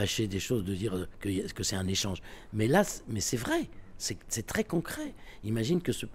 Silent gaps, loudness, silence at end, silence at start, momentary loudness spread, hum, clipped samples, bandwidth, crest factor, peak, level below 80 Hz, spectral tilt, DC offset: none; -32 LUFS; 0 s; 0 s; 11 LU; none; under 0.1%; 16 kHz; 20 dB; -12 dBFS; -50 dBFS; -4.5 dB/octave; under 0.1%